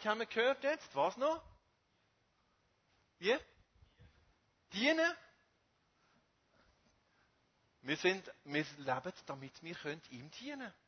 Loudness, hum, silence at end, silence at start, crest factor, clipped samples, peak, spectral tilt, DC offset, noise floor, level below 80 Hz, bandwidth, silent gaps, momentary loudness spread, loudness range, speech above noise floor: -37 LUFS; none; 0.15 s; 0 s; 24 dB; under 0.1%; -18 dBFS; -2 dB/octave; under 0.1%; -77 dBFS; -76 dBFS; 6.4 kHz; none; 15 LU; 4 LU; 39 dB